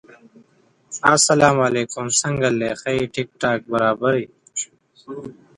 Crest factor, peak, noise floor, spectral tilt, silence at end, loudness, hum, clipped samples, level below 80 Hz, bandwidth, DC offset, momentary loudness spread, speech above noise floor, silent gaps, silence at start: 20 dB; 0 dBFS; -58 dBFS; -3.5 dB/octave; 0.25 s; -19 LUFS; none; under 0.1%; -54 dBFS; 11.5 kHz; under 0.1%; 19 LU; 38 dB; none; 0.9 s